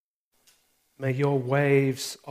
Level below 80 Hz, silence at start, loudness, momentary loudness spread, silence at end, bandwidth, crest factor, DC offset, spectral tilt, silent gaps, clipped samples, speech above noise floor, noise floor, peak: -70 dBFS; 1 s; -25 LUFS; 11 LU; 0 s; 15.5 kHz; 18 dB; under 0.1%; -6 dB/octave; none; under 0.1%; 42 dB; -67 dBFS; -10 dBFS